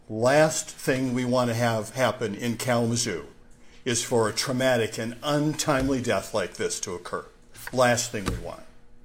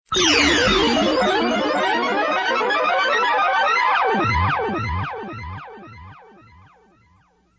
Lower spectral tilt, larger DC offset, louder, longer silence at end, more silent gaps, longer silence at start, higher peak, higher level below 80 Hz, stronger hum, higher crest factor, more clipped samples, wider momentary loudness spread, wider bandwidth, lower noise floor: about the same, -4 dB/octave vs -3.5 dB/octave; neither; second, -25 LUFS vs -18 LUFS; second, 0.05 s vs 1.45 s; neither; about the same, 0.1 s vs 0.1 s; second, -8 dBFS vs -4 dBFS; second, -48 dBFS vs -38 dBFS; neither; about the same, 18 dB vs 16 dB; neither; second, 12 LU vs 15 LU; first, 16.5 kHz vs 8 kHz; second, -48 dBFS vs -58 dBFS